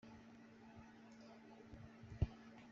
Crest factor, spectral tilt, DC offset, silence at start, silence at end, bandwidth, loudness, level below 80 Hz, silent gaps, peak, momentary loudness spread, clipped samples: 28 dB; -7.5 dB/octave; under 0.1%; 0.05 s; 0 s; 7.4 kHz; -53 LUFS; -58 dBFS; none; -24 dBFS; 16 LU; under 0.1%